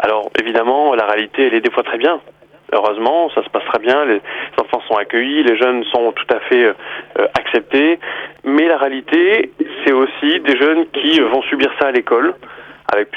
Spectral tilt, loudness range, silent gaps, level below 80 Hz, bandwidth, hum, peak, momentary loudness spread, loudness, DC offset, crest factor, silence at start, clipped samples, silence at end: -5 dB/octave; 2 LU; none; -58 dBFS; 7.2 kHz; none; -2 dBFS; 7 LU; -15 LUFS; under 0.1%; 14 dB; 0 s; under 0.1%; 0 s